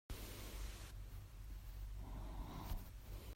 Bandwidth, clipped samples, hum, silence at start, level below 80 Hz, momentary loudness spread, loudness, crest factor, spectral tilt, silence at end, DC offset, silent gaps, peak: 16 kHz; under 0.1%; none; 0.1 s; -50 dBFS; 5 LU; -53 LUFS; 16 dB; -4.5 dB/octave; 0 s; under 0.1%; none; -32 dBFS